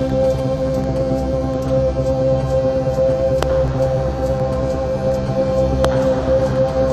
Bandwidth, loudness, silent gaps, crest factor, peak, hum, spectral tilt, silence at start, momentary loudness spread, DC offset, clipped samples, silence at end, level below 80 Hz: 12.5 kHz; -18 LUFS; none; 16 dB; -2 dBFS; none; -7.5 dB/octave; 0 s; 3 LU; under 0.1%; under 0.1%; 0 s; -28 dBFS